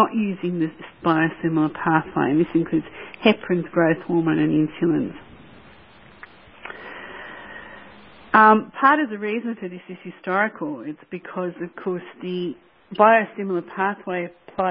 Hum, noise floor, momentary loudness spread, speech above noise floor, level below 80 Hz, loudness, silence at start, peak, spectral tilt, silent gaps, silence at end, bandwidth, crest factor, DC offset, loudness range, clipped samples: none; -49 dBFS; 20 LU; 27 dB; -60 dBFS; -21 LUFS; 0 s; 0 dBFS; -11 dB/octave; none; 0 s; 5.2 kHz; 22 dB; under 0.1%; 8 LU; under 0.1%